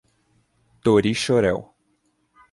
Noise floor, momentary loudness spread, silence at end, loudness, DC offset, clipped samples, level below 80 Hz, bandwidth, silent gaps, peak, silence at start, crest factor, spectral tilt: -68 dBFS; 7 LU; 0.9 s; -21 LUFS; under 0.1%; under 0.1%; -52 dBFS; 11.5 kHz; none; -6 dBFS; 0.85 s; 18 dB; -5.5 dB/octave